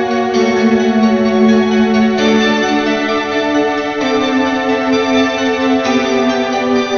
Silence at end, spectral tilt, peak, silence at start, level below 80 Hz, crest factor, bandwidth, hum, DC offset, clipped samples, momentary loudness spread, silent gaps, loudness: 0 s; -5 dB/octave; 0 dBFS; 0 s; -46 dBFS; 12 dB; 7 kHz; none; under 0.1%; under 0.1%; 3 LU; none; -13 LUFS